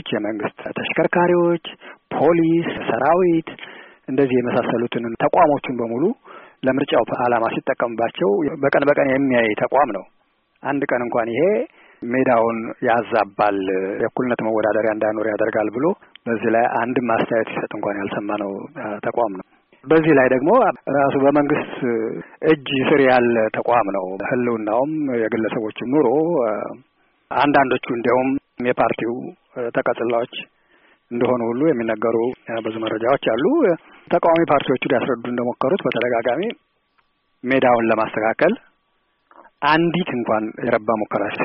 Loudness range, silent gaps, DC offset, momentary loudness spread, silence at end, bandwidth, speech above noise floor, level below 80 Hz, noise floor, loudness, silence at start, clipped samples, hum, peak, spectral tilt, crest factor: 4 LU; none; under 0.1%; 10 LU; 0 s; 5.2 kHz; 48 dB; -58 dBFS; -66 dBFS; -19 LUFS; 0.05 s; under 0.1%; none; -4 dBFS; -4.5 dB/octave; 16 dB